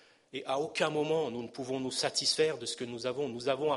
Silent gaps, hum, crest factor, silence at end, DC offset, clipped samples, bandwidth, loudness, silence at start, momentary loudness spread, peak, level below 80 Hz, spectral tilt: none; none; 20 dB; 0 s; under 0.1%; under 0.1%; 11.5 kHz; -32 LUFS; 0.35 s; 9 LU; -14 dBFS; -76 dBFS; -3 dB/octave